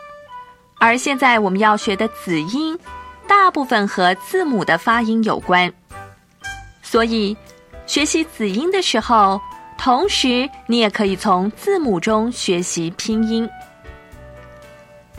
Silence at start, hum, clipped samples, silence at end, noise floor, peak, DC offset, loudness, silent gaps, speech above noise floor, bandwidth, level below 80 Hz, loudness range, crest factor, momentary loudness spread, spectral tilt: 0 s; none; under 0.1%; 0 s; -44 dBFS; 0 dBFS; under 0.1%; -17 LUFS; none; 26 dB; 15 kHz; -48 dBFS; 4 LU; 18 dB; 18 LU; -4 dB/octave